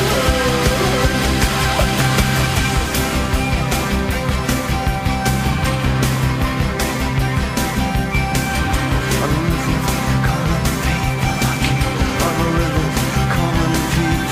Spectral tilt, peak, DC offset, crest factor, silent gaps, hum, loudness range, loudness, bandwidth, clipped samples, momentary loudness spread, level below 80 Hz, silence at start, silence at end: -5 dB/octave; -2 dBFS; under 0.1%; 14 dB; none; none; 2 LU; -17 LUFS; 16 kHz; under 0.1%; 3 LU; -24 dBFS; 0 s; 0 s